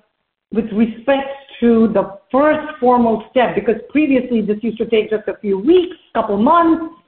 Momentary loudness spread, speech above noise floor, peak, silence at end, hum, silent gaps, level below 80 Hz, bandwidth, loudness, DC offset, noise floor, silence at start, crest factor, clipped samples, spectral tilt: 8 LU; 53 dB; -2 dBFS; 0.2 s; none; none; -50 dBFS; 4.3 kHz; -16 LUFS; under 0.1%; -68 dBFS; 0.5 s; 14 dB; under 0.1%; -5 dB/octave